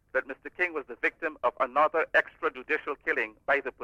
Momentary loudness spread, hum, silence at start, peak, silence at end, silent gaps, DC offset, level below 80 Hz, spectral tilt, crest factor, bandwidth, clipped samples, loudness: 7 LU; none; 0.15 s; -12 dBFS; 0 s; none; under 0.1%; -66 dBFS; -4.5 dB/octave; 18 dB; 10.5 kHz; under 0.1%; -29 LUFS